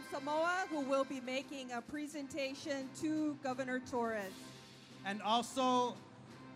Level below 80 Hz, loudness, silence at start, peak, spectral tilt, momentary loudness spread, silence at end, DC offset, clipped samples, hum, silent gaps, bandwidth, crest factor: -78 dBFS; -38 LUFS; 0 s; -20 dBFS; -4 dB/octave; 17 LU; 0 s; under 0.1%; under 0.1%; none; none; 15.5 kHz; 20 dB